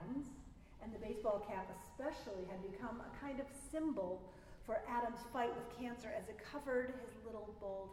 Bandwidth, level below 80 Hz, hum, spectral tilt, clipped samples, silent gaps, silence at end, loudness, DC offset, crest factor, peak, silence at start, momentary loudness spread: 16 kHz; -62 dBFS; none; -5.5 dB/octave; under 0.1%; none; 0 s; -45 LUFS; under 0.1%; 18 dB; -28 dBFS; 0 s; 10 LU